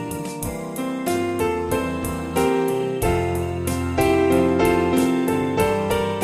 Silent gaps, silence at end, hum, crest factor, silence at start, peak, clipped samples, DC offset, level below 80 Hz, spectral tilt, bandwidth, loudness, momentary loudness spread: none; 0 s; none; 14 dB; 0 s; -6 dBFS; under 0.1%; under 0.1%; -38 dBFS; -5.5 dB/octave; 16 kHz; -21 LUFS; 9 LU